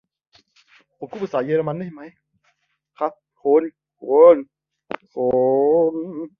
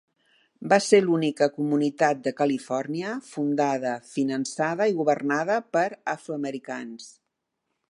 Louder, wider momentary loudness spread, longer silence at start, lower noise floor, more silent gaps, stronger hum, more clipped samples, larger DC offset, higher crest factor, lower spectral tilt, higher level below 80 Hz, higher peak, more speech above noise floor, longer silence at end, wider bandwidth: first, -19 LUFS vs -25 LUFS; first, 21 LU vs 12 LU; first, 1 s vs 0.6 s; second, -68 dBFS vs -81 dBFS; neither; neither; neither; neither; about the same, 18 dB vs 20 dB; first, -9 dB/octave vs -5 dB/octave; first, -64 dBFS vs -78 dBFS; first, -2 dBFS vs -6 dBFS; second, 50 dB vs 56 dB; second, 0.1 s vs 0.8 s; second, 5 kHz vs 11.5 kHz